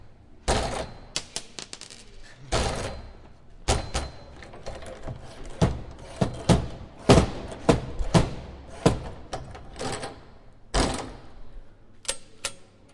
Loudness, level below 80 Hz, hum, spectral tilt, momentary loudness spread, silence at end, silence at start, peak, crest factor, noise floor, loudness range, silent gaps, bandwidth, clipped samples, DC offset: -28 LUFS; -38 dBFS; none; -5 dB/octave; 19 LU; 0.3 s; 0.05 s; -4 dBFS; 24 dB; -48 dBFS; 8 LU; none; 11.5 kHz; under 0.1%; under 0.1%